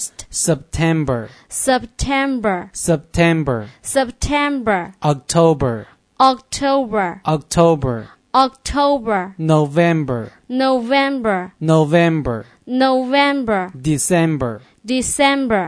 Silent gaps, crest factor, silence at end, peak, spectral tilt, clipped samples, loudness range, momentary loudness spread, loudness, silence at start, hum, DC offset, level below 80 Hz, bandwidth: none; 16 dB; 0 s; 0 dBFS; -5 dB/octave; under 0.1%; 2 LU; 8 LU; -17 LUFS; 0 s; none; under 0.1%; -38 dBFS; 11 kHz